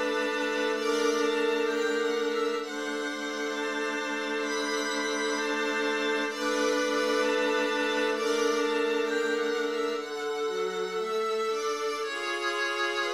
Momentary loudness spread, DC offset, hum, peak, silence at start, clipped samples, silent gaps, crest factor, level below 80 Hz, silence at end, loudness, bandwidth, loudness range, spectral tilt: 5 LU; under 0.1%; none; -14 dBFS; 0 s; under 0.1%; none; 14 dB; -78 dBFS; 0 s; -28 LUFS; 15 kHz; 3 LU; -1.5 dB/octave